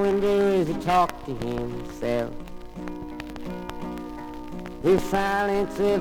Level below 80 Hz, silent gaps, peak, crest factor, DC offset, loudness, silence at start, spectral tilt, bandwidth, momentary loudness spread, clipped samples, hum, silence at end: -44 dBFS; none; -8 dBFS; 18 dB; under 0.1%; -26 LUFS; 0 s; -6 dB/octave; 17.5 kHz; 15 LU; under 0.1%; none; 0 s